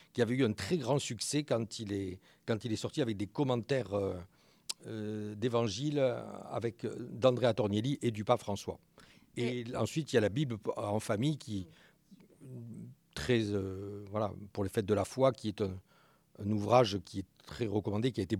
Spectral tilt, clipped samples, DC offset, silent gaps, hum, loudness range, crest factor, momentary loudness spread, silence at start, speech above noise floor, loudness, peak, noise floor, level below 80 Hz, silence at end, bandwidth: -6 dB/octave; under 0.1%; under 0.1%; none; none; 4 LU; 24 dB; 14 LU; 0.15 s; 28 dB; -34 LUFS; -12 dBFS; -61 dBFS; -68 dBFS; 0 s; 16 kHz